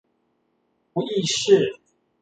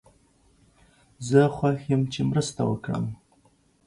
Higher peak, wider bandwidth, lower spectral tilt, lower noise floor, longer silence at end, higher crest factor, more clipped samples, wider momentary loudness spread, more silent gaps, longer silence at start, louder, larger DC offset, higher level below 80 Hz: about the same, -4 dBFS vs -6 dBFS; second, 9.2 kHz vs 11.5 kHz; second, -4 dB/octave vs -6.5 dB/octave; first, -70 dBFS vs -62 dBFS; second, 0.45 s vs 0.7 s; about the same, 20 dB vs 20 dB; neither; about the same, 11 LU vs 13 LU; neither; second, 0.95 s vs 1.2 s; first, -21 LUFS vs -25 LUFS; neither; second, -68 dBFS vs -56 dBFS